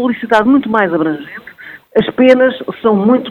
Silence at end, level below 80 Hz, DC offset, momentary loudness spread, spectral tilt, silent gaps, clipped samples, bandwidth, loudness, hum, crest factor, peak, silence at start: 0 s; -52 dBFS; under 0.1%; 16 LU; -7 dB/octave; none; 0.2%; 7.4 kHz; -12 LUFS; none; 12 dB; 0 dBFS; 0 s